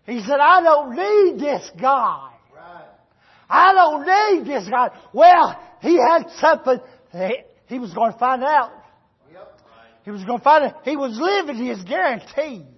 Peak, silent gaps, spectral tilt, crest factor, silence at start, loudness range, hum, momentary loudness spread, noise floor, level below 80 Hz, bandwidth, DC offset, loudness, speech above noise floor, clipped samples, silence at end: -2 dBFS; none; -4.5 dB/octave; 16 dB; 0.1 s; 7 LU; none; 14 LU; -55 dBFS; -68 dBFS; 6.2 kHz; under 0.1%; -17 LUFS; 38 dB; under 0.1%; 0.15 s